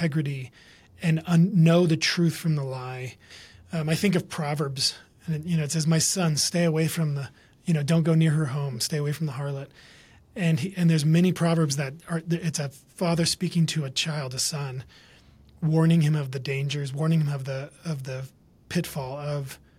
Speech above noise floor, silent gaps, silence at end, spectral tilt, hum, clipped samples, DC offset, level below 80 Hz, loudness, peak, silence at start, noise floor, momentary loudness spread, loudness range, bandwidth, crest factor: 29 dB; none; 0.25 s; -5.5 dB/octave; none; under 0.1%; under 0.1%; -60 dBFS; -25 LUFS; -8 dBFS; 0 s; -54 dBFS; 13 LU; 4 LU; 15 kHz; 18 dB